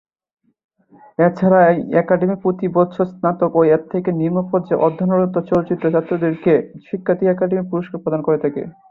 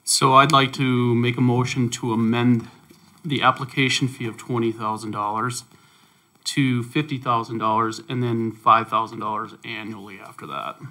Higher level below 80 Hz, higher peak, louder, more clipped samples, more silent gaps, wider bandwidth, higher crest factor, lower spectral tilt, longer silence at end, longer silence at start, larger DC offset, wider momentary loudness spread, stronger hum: first, -58 dBFS vs -66 dBFS; about the same, -2 dBFS vs 0 dBFS; first, -17 LUFS vs -21 LUFS; neither; neither; second, 5.8 kHz vs 16.5 kHz; second, 16 dB vs 22 dB; first, -11 dB/octave vs -4.5 dB/octave; first, 0.2 s vs 0 s; first, 1.2 s vs 0.05 s; neither; second, 8 LU vs 14 LU; neither